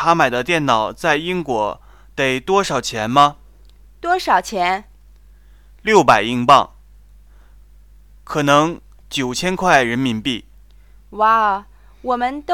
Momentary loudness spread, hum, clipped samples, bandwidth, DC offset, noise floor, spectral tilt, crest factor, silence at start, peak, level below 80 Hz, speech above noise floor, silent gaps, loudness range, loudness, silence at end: 12 LU; 50 Hz at -45 dBFS; under 0.1%; 17.5 kHz; 0.2%; -46 dBFS; -4 dB/octave; 18 dB; 0 s; 0 dBFS; -46 dBFS; 30 dB; none; 2 LU; -17 LUFS; 0 s